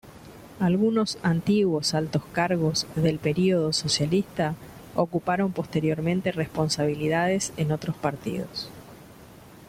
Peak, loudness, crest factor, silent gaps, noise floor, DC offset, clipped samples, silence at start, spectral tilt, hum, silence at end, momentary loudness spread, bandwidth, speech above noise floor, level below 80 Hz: -8 dBFS; -25 LUFS; 18 dB; none; -48 dBFS; under 0.1%; under 0.1%; 0.05 s; -5.5 dB/octave; none; 0.05 s; 9 LU; 16 kHz; 23 dB; -56 dBFS